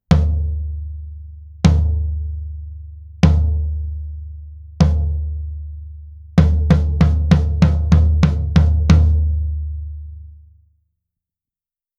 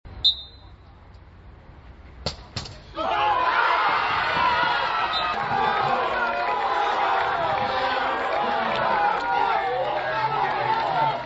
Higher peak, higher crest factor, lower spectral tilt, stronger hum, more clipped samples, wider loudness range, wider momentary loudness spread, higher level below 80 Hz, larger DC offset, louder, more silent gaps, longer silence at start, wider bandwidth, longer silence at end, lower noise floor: first, 0 dBFS vs -6 dBFS; about the same, 16 dB vs 18 dB; first, -8 dB/octave vs -4 dB/octave; neither; neither; about the same, 6 LU vs 4 LU; first, 21 LU vs 10 LU; first, -20 dBFS vs -50 dBFS; neither; first, -17 LUFS vs -23 LUFS; neither; about the same, 0.1 s vs 0.05 s; second, 7 kHz vs 8 kHz; first, 1.65 s vs 0 s; first, under -90 dBFS vs -47 dBFS